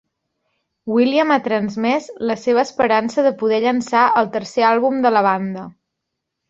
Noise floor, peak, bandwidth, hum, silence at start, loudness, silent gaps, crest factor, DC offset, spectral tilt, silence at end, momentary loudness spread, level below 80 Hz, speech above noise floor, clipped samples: -78 dBFS; -2 dBFS; 7.8 kHz; none; 0.85 s; -17 LUFS; none; 16 dB; under 0.1%; -5.5 dB/octave; 0.8 s; 7 LU; -62 dBFS; 62 dB; under 0.1%